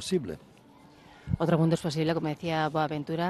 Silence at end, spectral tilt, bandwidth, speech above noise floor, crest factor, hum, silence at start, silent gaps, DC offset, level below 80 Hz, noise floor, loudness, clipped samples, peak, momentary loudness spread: 0 s; -6.5 dB/octave; 12.5 kHz; 27 dB; 16 dB; none; 0 s; none; under 0.1%; -54 dBFS; -55 dBFS; -29 LUFS; under 0.1%; -12 dBFS; 14 LU